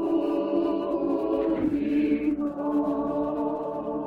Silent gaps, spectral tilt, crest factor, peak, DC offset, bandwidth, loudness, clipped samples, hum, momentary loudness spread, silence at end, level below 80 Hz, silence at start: none; -8.5 dB/octave; 12 dB; -14 dBFS; under 0.1%; 5 kHz; -26 LUFS; under 0.1%; none; 4 LU; 0 s; -54 dBFS; 0 s